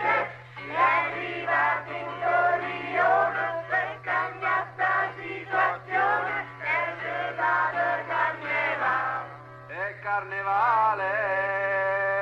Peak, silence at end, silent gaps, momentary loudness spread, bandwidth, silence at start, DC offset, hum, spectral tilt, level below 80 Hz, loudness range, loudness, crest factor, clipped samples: -10 dBFS; 0 s; none; 8 LU; 8.4 kHz; 0 s; under 0.1%; none; -5.5 dB/octave; -70 dBFS; 2 LU; -26 LUFS; 16 dB; under 0.1%